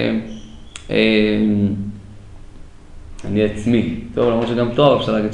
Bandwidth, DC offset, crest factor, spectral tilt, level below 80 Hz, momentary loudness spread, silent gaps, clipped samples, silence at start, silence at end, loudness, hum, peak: 10 kHz; under 0.1%; 18 dB; -7 dB/octave; -40 dBFS; 20 LU; none; under 0.1%; 0 s; 0 s; -17 LUFS; none; 0 dBFS